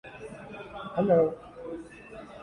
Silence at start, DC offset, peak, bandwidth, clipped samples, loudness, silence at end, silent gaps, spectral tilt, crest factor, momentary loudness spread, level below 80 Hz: 0.05 s; under 0.1%; -12 dBFS; 10.5 kHz; under 0.1%; -26 LUFS; 0 s; none; -8.5 dB/octave; 18 dB; 21 LU; -60 dBFS